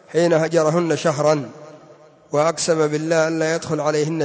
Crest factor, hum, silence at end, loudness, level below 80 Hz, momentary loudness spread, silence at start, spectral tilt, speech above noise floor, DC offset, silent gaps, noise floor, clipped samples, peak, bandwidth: 14 dB; none; 0 s; -19 LUFS; -64 dBFS; 4 LU; 0.1 s; -5 dB/octave; 29 dB; under 0.1%; none; -47 dBFS; under 0.1%; -4 dBFS; 8 kHz